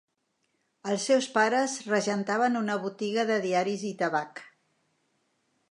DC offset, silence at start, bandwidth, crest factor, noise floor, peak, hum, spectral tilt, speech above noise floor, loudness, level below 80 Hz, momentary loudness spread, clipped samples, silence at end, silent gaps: under 0.1%; 0.85 s; 11 kHz; 20 dB; -76 dBFS; -10 dBFS; none; -4 dB/octave; 49 dB; -27 LUFS; -82 dBFS; 8 LU; under 0.1%; 1.25 s; none